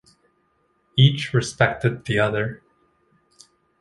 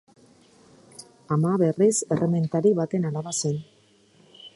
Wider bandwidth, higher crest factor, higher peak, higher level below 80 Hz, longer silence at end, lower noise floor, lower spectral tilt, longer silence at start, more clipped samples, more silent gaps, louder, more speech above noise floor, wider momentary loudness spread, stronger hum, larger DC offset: about the same, 11.5 kHz vs 11.5 kHz; about the same, 22 dB vs 18 dB; first, -2 dBFS vs -8 dBFS; first, -54 dBFS vs -68 dBFS; first, 1.25 s vs 0.1 s; first, -66 dBFS vs -58 dBFS; about the same, -5.5 dB/octave vs -6 dB/octave; about the same, 0.95 s vs 1 s; neither; neither; first, -21 LUFS vs -24 LUFS; first, 46 dB vs 36 dB; second, 9 LU vs 16 LU; neither; neither